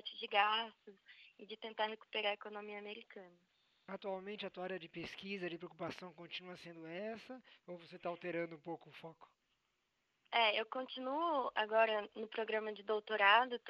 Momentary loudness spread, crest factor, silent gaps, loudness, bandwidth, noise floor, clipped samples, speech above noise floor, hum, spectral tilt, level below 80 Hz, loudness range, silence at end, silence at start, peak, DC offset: 20 LU; 26 dB; none; -39 LUFS; 7.4 kHz; -84 dBFS; under 0.1%; 44 dB; none; -5 dB/octave; -86 dBFS; 10 LU; 0 s; 0.05 s; -14 dBFS; under 0.1%